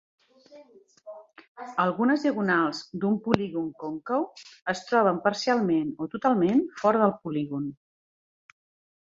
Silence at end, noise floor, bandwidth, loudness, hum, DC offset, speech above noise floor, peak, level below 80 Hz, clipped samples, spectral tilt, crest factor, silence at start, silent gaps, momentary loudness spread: 1.3 s; under -90 dBFS; 7.8 kHz; -26 LUFS; none; under 0.1%; over 64 dB; -2 dBFS; -66 dBFS; under 0.1%; -6 dB/octave; 26 dB; 0.5 s; 1.48-1.55 s; 13 LU